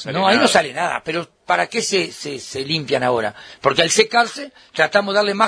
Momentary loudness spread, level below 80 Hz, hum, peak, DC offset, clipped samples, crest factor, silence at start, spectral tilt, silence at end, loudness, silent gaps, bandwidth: 13 LU; -60 dBFS; none; 0 dBFS; under 0.1%; under 0.1%; 18 dB; 0 s; -3 dB/octave; 0 s; -18 LUFS; none; 11 kHz